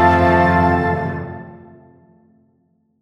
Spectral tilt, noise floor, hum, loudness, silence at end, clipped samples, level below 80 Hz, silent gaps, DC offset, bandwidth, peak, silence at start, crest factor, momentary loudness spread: -8 dB/octave; -62 dBFS; none; -16 LUFS; 1.45 s; under 0.1%; -38 dBFS; none; under 0.1%; 9.4 kHz; -2 dBFS; 0 s; 16 dB; 21 LU